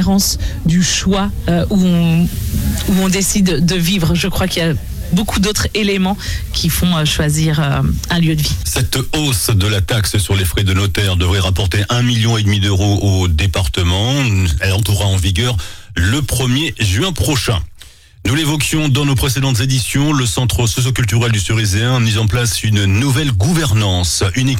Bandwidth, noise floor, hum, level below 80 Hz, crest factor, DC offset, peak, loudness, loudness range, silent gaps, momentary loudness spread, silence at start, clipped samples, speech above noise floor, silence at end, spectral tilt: 16.5 kHz; -39 dBFS; none; -26 dBFS; 10 dB; under 0.1%; -4 dBFS; -15 LUFS; 1 LU; none; 3 LU; 0 s; under 0.1%; 25 dB; 0 s; -4.5 dB/octave